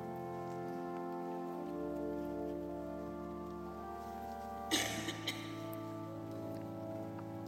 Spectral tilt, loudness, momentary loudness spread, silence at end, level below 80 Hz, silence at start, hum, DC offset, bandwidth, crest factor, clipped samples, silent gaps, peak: -4 dB/octave; -42 LUFS; 8 LU; 0 s; -64 dBFS; 0 s; none; under 0.1%; 16 kHz; 22 dB; under 0.1%; none; -20 dBFS